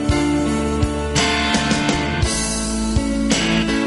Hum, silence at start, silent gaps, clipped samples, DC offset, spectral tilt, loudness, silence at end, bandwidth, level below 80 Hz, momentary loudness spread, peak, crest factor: none; 0 s; none; under 0.1%; under 0.1%; -4 dB/octave; -18 LUFS; 0 s; 11.5 kHz; -28 dBFS; 4 LU; -2 dBFS; 16 dB